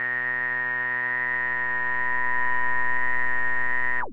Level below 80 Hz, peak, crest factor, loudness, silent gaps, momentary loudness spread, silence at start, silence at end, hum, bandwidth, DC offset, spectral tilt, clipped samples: -62 dBFS; -12 dBFS; 10 dB; -24 LUFS; none; 1 LU; 0 s; 0 s; none; 5.4 kHz; under 0.1%; -6.5 dB/octave; under 0.1%